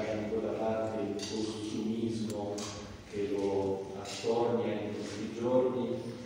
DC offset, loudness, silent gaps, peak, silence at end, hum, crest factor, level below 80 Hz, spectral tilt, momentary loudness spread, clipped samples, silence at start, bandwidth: under 0.1%; -34 LUFS; none; -18 dBFS; 0 s; none; 16 dB; -64 dBFS; -5.5 dB/octave; 8 LU; under 0.1%; 0 s; 16 kHz